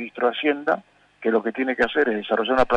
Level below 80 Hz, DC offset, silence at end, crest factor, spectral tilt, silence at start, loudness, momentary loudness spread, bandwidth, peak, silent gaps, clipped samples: -50 dBFS; under 0.1%; 0 s; 14 dB; -5.5 dB/octave; 0 s; -23 LUFS; 5 LU; 8.8 kHz; -8 dBFS; none; under 0.1%